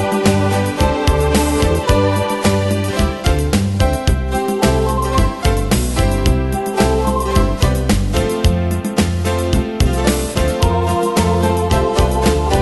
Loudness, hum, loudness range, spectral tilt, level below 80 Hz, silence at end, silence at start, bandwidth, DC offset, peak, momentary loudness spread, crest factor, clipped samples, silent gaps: -16 LUFS; none; 1 LU; -5.5 dB/octave; -20 dBFS; 0 s; 0 s; 12.5 kHz; under 0.1%; 0 dBFS; 3 LU; 14 dB; under 0.1%; none